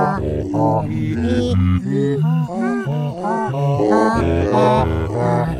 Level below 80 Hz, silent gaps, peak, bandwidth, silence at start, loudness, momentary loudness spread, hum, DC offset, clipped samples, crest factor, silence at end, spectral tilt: -34 dBFS; none; -2 dBFS; 11 kHz; 0 s; -18 LUFS; 6 LU; none; under 0.1%; under 0.1%; 14 dB; 0 s; -8 dB/octave